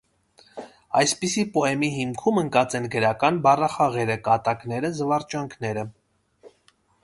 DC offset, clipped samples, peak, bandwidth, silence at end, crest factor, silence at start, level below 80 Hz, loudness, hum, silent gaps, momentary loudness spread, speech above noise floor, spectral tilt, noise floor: under 0.1%; under 0.1%; -4 dBFS; 11.5 kHz; 0.55 s; 20 dB; 0.55 s; -60 dBFS; -23 LUFS; none; none; 12 LU; 40 dB; -4.5 dB/octave; -63 dBFS